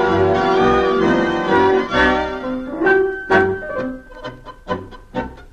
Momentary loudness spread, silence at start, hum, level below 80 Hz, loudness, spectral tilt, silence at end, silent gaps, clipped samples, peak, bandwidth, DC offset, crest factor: 14 LU; 0 s; none; -38 dBFS; -17 LUFS; -6.5 dB/octave; 0.1 s; none; under 0.1%; -2 dBFS; 8 kHz; 0.1%; 14 dB